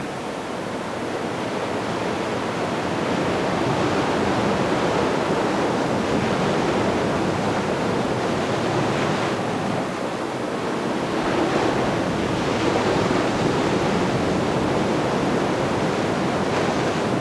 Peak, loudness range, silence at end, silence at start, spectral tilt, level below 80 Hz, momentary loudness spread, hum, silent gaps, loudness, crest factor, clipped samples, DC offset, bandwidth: -6 dBFS; 2 LU; 0 s; 0 s; -5.5 dB/octave; -46 dBFS; 5 LU; none; none; -22 LUFS; 16 dB; under 0.1%; under 0.1%; 11 kHz